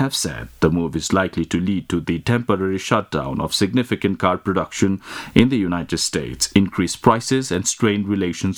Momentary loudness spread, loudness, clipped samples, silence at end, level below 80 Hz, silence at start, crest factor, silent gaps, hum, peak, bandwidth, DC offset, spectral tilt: 5 LU; -20 LUFS; under 0.1%; 0 s; -44 dBFS; 0 s; 20 dB; none; none; 0 dBFS; 18.5 kHz; under 0.1%; -4.5 dB/octave